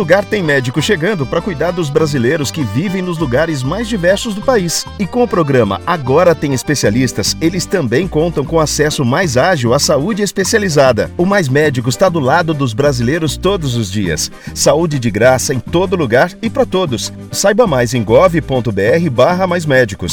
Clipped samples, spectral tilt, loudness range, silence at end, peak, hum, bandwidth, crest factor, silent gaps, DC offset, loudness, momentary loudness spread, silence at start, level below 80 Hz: under 0.1%; -5 dB/octave; 3 LU; 0 s; 0 dBFS; none; 20 kHz; 12 dB; none; under 0.1%; -13 LUFS; 6 LU; 0 s; -36 dBFS